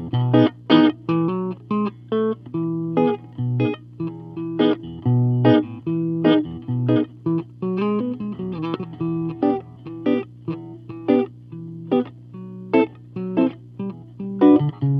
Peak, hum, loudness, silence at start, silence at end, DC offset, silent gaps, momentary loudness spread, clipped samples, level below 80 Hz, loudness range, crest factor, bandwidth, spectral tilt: -2 dBFS; 60 Hz at -40 dBFS; -21 LUFS; 0 s; 0 s; under 0.1%; none; 15 LU; under 0.1%; -60 dBFS; 5 LU; 20 dB; 5.8 kHz; -10.5 dB/octave